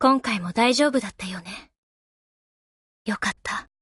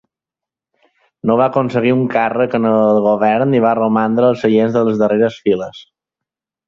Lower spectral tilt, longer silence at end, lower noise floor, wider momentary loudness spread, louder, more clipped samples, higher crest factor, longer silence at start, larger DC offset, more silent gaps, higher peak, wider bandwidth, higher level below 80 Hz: second, -4 dB/octave vs -8 dB/octave; second, 0.2 s vs 0.85 s; first, under -90 dBFS vs -86 dBFS; first, 17 LU vs 4 LU; second, -24 LUFS vs -14 LUFS; neither; first, 20 dB vs 14 dB; second, 0 s vs 1.25 s; neither; first, 1.78-3.05 s vs none; second, -6 dBFS vs -2 dBFS; first, 11.5 kHz vs 7 kHz; about the same, -58 dBFS vs -58 dBFS